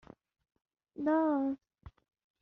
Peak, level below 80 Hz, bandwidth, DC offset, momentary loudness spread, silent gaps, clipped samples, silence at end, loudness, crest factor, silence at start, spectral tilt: -20 dBFS; -66 dBFS; 4.1 kHz; under 0.1%; 16 LU; none; under 0.1%; 0.5 s; -33 LUFS; 16 dB; 1 s; -6.5 dB/octave